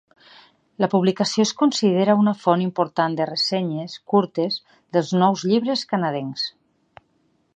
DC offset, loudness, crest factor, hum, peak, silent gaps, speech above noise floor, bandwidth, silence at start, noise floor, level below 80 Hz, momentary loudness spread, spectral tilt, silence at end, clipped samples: under 0.1%; -21 LUFS; 18 dB; none; -4 dBFS; none; 45 dB; 8.8 kHz; 0.8 s; -65 dBFS; -70 dBFS; 8 LU; -5.5 dB/octave; 1.05 s; under 0.1%